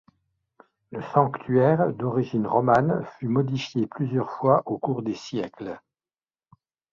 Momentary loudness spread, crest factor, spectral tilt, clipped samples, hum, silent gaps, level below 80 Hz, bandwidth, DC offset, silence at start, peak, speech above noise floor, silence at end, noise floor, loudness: 13 LU; 22 dB; -8 dB/octave; under 0.1%; none; none; -62 dBFS; 7.2 kHz; under 0.1%; 0.9 s; -4 dBFS; over 66 dB; 1.15 s; under -90 dBFS; -24 LUFS